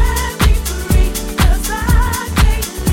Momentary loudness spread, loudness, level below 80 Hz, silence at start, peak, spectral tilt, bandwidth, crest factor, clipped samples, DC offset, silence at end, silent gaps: 3 LU; -16 LUFS; -14 dBFS; 0 s; -2 dBFS; -4.5 dB/octave; 17 kHz; 12 dB; under 0.1%; under 0.1%; 0 s; none